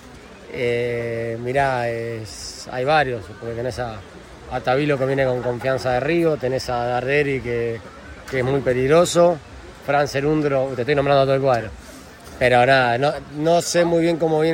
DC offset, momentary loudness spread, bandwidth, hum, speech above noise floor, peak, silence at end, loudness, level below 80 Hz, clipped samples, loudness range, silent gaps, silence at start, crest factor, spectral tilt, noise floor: under 0.1%; 16 LU; 16.5 kHz; none; 21 dB; -4 dBFS; 0 s; -20 LUFS; -46 dBFS; under 0.1%; 5 LU; none; 0 s; 16 dB; -5.5 dB/octave; -41 dBFS